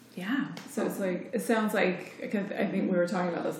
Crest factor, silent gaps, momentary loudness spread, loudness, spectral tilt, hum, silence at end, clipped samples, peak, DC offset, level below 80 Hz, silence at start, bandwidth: 18 dB; none; 6 LU; -30 LUFS; -6 dB/octave; none; 0 s; under 0.1%; -12 dBFS; under 0.1%; -88 dBFS; 0.15 s; 17.5 kHz